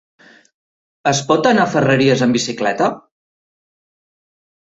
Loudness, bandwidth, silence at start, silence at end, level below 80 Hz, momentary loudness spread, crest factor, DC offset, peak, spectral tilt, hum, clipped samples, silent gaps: -15 LUFS; 8 kHz; 1.05 s; 1.75 s; -56 dBFS; 7 LU; 18 dB; under 0.1%; 0 dBFS; -4.5 dB/octave; none; under 0.1%; none